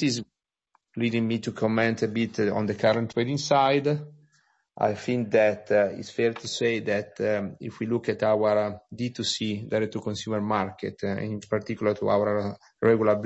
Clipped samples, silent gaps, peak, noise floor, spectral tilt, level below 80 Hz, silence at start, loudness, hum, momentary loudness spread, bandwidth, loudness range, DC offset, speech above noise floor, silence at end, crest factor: under 0.1%; none; -8 dBFS; -71 dBFS; -5.5 dB/octave; -66 dBFS; 0 s; -26 LUFS; none; 10 LU; 8.2 kHz; 3 LU; under 0.1%; 45 dB; 0 s; 18 dB